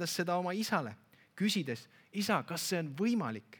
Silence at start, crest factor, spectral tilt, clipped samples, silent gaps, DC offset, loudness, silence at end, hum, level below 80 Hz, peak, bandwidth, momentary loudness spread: 0 s; 20 dB; -4.5 dB/octave; under 0.1%; none; under 0.1%; -34 LUFS; 0.05 s; none; -84 dBFS; -16 dBFS; 19 kHz; 9 LU